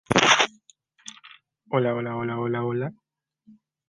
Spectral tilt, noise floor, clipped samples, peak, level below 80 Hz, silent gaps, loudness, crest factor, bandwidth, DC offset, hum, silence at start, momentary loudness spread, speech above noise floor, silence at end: -3.5 dB/octave; -60 dBFS; under 0.1%; -2 dBFS; -60 dBFS; none; -23 LUFS; 26 dB; 11.5 kHz; under 0.1%; none; 0.1 s; 25 LU; 34 dB; 0.95 s